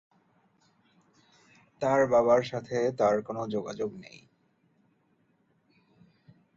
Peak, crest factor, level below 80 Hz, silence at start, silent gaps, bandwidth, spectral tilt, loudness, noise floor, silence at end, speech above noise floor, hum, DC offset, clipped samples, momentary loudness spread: -12 dBFS; 20 dB; -70 dBFS; 1.8 s; none; 7.6 kHz; -6 dB/octave; -27 LUFS; -70 dBFS; 2.5 s; 43 dB; none; under 0.1%; under 0.1%; 13 LU